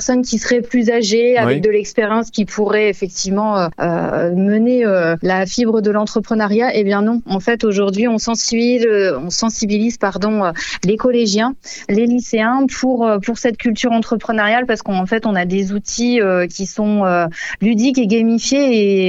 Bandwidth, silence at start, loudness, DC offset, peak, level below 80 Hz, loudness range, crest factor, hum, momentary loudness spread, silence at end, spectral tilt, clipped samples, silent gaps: 8 kHz; 0 s; -16 LUFS; under 0.1%; -2 dBFS; -46 dBFS; 1 LU; 14 dB; none; 5 LU; 0 s; -4.5 dB/octave; under 0.1%; none